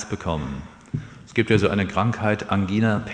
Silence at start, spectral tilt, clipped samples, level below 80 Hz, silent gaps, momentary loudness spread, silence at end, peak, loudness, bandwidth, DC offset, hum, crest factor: 0 s; -6.5 dB/octave; under 0.1%; -44 dBFS; none; 14 LU; 0 s; -4 dBFS; -23 LUFS; 9.6 kHz; under 0.1%; none; 18 dB